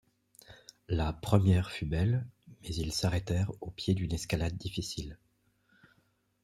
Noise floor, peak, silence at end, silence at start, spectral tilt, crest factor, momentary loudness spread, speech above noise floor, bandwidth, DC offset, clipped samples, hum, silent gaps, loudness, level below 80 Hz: -72 dBFS; -8 dBFS; 1.3 s; 0.5 s; -6 dB/octave; 24 dB; 19 LU; 42 dB; 14 kHz; under 0.1%; under 0.1%; none; none; -32 LUFS; -48 dBFS